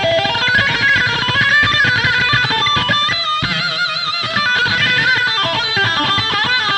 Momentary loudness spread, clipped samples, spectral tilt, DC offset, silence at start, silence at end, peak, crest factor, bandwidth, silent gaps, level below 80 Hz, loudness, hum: 4 LU; under 0.1%; -3 dB/octave; under 0.1%; 0 s; 0 s; 0 dBFS; 14 dB; 11 kHz; none; -42 dBFS; -13 LUFS; none